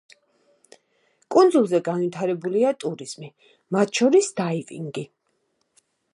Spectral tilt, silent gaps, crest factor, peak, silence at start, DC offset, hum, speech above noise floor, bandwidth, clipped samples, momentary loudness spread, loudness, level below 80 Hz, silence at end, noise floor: -5.5 dB/octave; none; 20 dB; -4 dBFS; 1.3 s; under 0.1%; none; 50 dB; 11.5 kHz; under 0.1%; 18 LU; -22 LUFS; -78 dBFS; 1.1 s; -71 dBFS